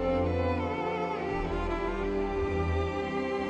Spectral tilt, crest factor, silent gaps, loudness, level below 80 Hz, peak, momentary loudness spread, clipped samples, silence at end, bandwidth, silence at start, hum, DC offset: -7.5 dB/octave; 12 dB; none; -31 LUFS; -40 dBFS; -18 dBFS; 3 LU; under 0.1%; 0 s; 8.8 kHz; 0 s; none; under 0.1%